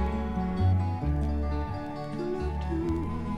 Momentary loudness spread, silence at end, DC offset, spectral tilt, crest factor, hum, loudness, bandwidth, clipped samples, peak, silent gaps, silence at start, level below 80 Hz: 8 LU; 0 s; under 0.1%; -9 dB/octave; 14 dB; none; -30 LUFS; 8.2 kHz; under 0.1%; -16 dBFS; none; 0 s; -34 dBFS